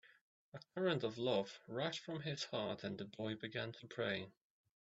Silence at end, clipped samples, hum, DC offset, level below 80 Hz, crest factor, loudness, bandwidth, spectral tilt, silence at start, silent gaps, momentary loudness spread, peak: 0.55 s; under 0.1%; none; under 0.1%; -82 dBFS; 20 dB; -43 LUFS; 8 kHz; -4 dB/octave; 0.05 s; 0.21-0.52 s; 9 LU; -24 dBFS